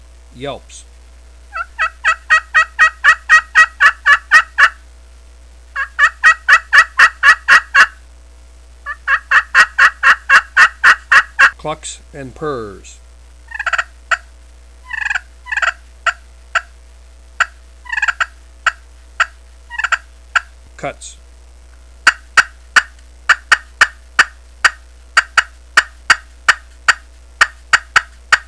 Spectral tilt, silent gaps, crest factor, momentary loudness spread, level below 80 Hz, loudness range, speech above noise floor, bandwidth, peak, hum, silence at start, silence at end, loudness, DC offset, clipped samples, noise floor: -0.5 dB/octave; none; 16 dB; 18 LU; -40 dBFS; 11 LU; 14 dB; 11 kHz; 0 dBFS; none; 0.4 s; 0.05 s; -12 LUFS; 0.3%; 0.4%; -40 dBFS